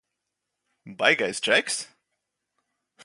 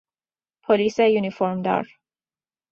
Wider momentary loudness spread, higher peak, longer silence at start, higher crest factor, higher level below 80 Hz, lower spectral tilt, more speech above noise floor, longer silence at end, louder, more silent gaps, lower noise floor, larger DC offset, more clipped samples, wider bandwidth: second, 10 LU vs 14 LU; about the same, -4 dBFS vs -6 dBFS; first, 0.85 s vs 0.7 s; first, 26 dB vs 18 dB; second, -76 dBFS vs -66 dBFS; second, -1.5 dB/octave vs -6.5 dB/octave; second, 58 dB vs over 69 dB; first, 1.2 s vs 0.85 s; about the same, -23 LUFS vs -21 LUFS; neither; second, -83 dBFS vs under -90 dBFS; neither; neither; first, 11.5 kHz vs 7.2 kHz